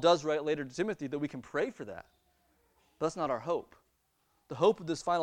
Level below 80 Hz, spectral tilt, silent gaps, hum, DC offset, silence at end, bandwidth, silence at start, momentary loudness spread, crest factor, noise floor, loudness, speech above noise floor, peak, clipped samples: -70 dBFS; -5 dB/octave; none; none; under 0.1%; 0 s; 10.5 kHz; 0 s; 13 LU; 20 dB; -75 dBFS; -33 LUFS; 43 dB; -12 dBFS; under 0.1%